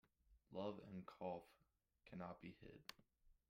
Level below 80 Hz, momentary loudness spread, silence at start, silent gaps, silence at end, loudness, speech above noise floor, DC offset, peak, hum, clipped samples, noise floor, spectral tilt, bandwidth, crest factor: -80 dBFS; 9 LU; 0.3 s; none; 0.15 s; -55 LUFS; 19 dB; under 0.1%; -34 dBFS; none; under 0.1%; -73 dBFS; -6.5 dB/octave; 15.5 kHz; 22 dB